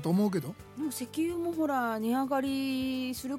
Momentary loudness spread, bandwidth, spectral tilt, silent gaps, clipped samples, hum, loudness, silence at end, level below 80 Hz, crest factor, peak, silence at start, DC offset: 7 LU; 16.5 kHz; -5.5 dB/octave; none; under 0.1%; none; -31 LUFS; 0 s; -62 dBFS; 12 dB; -18 dBFS; 0 s; under 0.1%